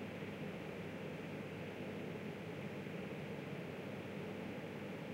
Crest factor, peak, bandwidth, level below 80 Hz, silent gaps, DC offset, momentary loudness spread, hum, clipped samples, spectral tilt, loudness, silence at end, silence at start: 12 dB; -34 dBFS; 16 kHz; -74 dBFS; none; under 0.1%; 1 LU; none; under 0.1%; -6.5 dB/octave; -47 LUFS; 0 s; 0 s